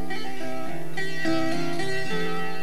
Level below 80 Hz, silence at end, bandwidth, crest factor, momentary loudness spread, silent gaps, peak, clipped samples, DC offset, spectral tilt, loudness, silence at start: -66 dBFS; 0 s; 16.5 kHz; 16 dB; 7 LU; none; -12 dBFS; under 0.1%; 9%; -5 dB/octave; -29 LUFS; 0 s